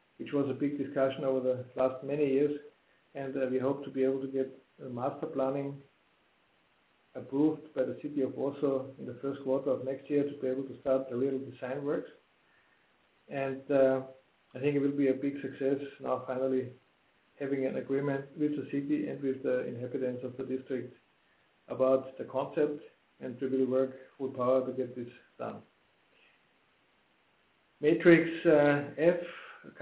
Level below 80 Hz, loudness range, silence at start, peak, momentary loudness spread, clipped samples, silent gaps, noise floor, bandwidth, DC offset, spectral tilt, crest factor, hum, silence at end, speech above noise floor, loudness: -76 dBFS; 5 LU; 0.2 s; -8 dBFS; 14 LU; under 0.1%; none; -70 dBFS; 4 kHz; under 0.1%; -6.5 dB/octave; 24 dB; none; 0 s; 39 dB; -32 LUFS